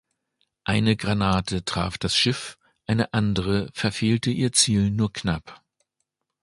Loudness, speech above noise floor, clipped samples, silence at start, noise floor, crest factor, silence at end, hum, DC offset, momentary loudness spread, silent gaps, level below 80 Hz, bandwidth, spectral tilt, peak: -23 LUFS; 56 dB; under 0.1%; 0.65 s; -79 dBFS; 20 dB; 0.85 s; none; under 0.1%; 9 LU; none; -44 dBFS; 11.5 kHz; -4.5 dB/octave; -4 dBFS